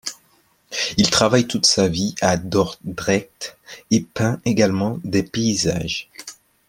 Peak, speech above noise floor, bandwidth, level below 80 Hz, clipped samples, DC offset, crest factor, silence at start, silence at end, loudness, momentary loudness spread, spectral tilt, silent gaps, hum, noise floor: -2 dBFS; 39 dB; 16.5 kHz; -50 dBFS; under 0.1%; under 0.1%; 20 dB; 0.05 s; 0.35 s; -19 LUFS; 16 LU; -4 dB/octave; none; none; -59 dBFS